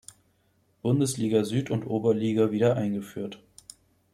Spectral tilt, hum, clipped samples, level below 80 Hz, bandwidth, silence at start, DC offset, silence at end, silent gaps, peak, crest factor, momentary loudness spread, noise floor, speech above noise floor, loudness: -6.5 dB/octave; none; under 0.1%; -66 dBFS; 14 kHz; 0.85 s; under 0.1%; 0.75 s; none; -10 dBFS; 16 dB; 13 LU; -68 dBFS; 42 dB; -26 LUFS